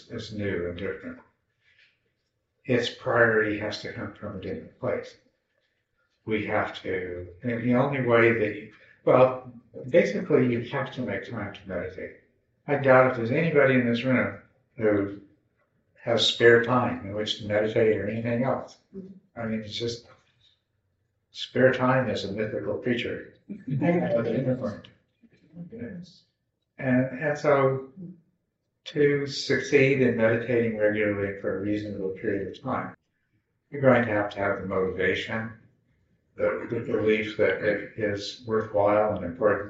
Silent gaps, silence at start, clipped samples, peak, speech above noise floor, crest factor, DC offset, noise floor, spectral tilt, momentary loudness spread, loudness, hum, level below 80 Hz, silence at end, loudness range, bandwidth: none; 0.1 s; under 0.1%; -2 dBFS; 52 dB; 24 dB; under 0.1%; -77 dBFS; -4.5 dB/octave; 19 LU; -25 LUFS; none; -62 dBFS; 0 s; 6 LU; 8 kHz